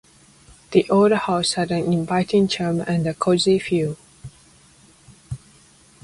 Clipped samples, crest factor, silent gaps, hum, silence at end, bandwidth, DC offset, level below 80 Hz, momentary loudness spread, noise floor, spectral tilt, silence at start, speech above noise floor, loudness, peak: under 0.1%; 20 dB; none; none; 0.65 s; 11.5 kHz; under 0.1%; -54 dBFS; 20 LU; -52 dBFS; -5.5 dB/octave; 0.7 s; 33 dB; -20 LUFS; -2 dBFS